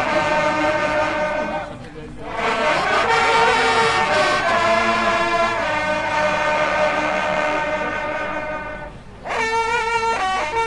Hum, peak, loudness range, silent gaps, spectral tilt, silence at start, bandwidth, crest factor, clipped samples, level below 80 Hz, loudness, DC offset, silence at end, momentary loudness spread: none; -4 dBFS; 5 LU; none; -3.5 dB/octave; 0 s; 11.5 kHz; 16 dB; under 0.1%; -44 dBFS; -19 LUFS; 0.2%; 0 s; 12 LU